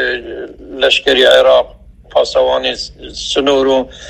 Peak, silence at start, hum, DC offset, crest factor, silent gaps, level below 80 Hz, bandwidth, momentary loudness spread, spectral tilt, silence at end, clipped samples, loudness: 0 dBFS; 0 s; none; under 0.1%; 14 dB; none; -40 dBFS; 12.5 kHz; 17 LU; -2.5 dB/octave; 0 s; 0.2%; -12 LUFS